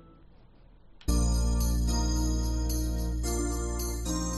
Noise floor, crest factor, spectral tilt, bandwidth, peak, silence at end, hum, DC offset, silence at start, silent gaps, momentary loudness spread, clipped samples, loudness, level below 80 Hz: -54 dBFS; 16 dB; -5 dB/octave; 13.5 kHz; -14 dBFS; 0 s; none; under 0.1%; 0.9 s; none; 4 LU; under 0.1%; -30 LUFS; -30 dBFS